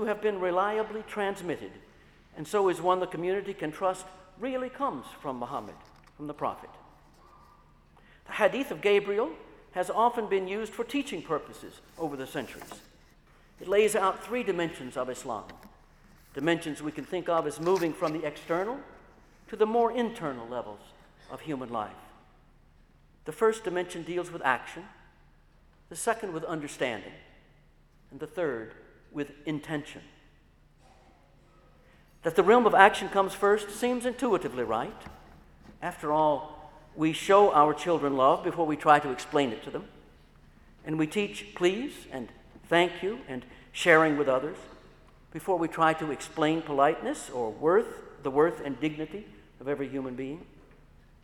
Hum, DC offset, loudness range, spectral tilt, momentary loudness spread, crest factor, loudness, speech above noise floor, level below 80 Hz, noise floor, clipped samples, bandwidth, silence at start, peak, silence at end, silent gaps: none; under 0.1%; 12 LU; -5 dB/octave; 19 LU; 28 dB; -29 LUFS; 32 dB; -60 dBFS; -60 dBFS; under 0.1%; 17 kHz; 0 s; -2 dBFS; 0.8 s; none